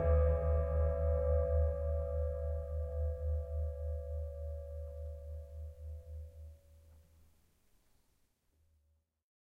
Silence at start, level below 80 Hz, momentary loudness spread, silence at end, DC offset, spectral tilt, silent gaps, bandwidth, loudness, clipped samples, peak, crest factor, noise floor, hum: 0 s; -38 dBFS; 17 LU; 2.45 s; under 0.1%; -10.5 dB/octave; none; 2.6 kHz; -37 LUFS; under 0.1%; -20 dBFS; 18 dB; -77 dBFS; none